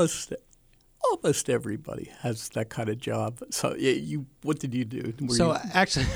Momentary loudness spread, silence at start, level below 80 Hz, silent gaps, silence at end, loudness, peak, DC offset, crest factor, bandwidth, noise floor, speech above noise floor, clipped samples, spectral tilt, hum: 11 LU; 0 s; -46 dBFS; none; 0 s; -28 LUFS; -6 dBFS; under 0.1%; 22 dB; over 20 kHz; -60 dBFS; 32 dB; under 0.1%; -4.5 dB/octave; none